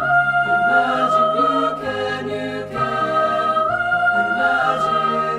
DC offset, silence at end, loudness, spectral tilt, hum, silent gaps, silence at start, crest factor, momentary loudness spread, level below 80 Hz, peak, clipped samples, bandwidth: under 0.1%; 0 s; -18 LUFS; -5.5 dB/octave; none; none; 0 s; 14 dB; 7 LU; -52 dBFS; -4 dBFS; under 0.1%; 11 kHz